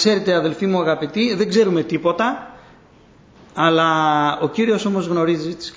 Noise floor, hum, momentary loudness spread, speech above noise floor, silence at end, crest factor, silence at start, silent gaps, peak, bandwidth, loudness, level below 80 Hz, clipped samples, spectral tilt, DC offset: -49 dBFS; none; 5 LU; 31 dB; 0.05 s; 16 dB; 0 s; none; -4 dBFS; 8 kHz; -18 LUFS; -58 dBFS; under 0.1%; -5.5 dB/octave; under 0.1%